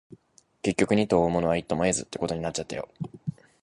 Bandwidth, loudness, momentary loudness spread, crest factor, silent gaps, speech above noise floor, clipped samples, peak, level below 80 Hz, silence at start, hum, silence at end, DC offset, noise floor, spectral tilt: 11.5 kHz; -27 LUFS; 14 LU; 20 dB; none; 36 dB; under 0.1%; -8 dBFS; -52 dBFS; 0.65 s; none; 0.3 s; under 0.1%; -61 dBFS; -5 dB/octave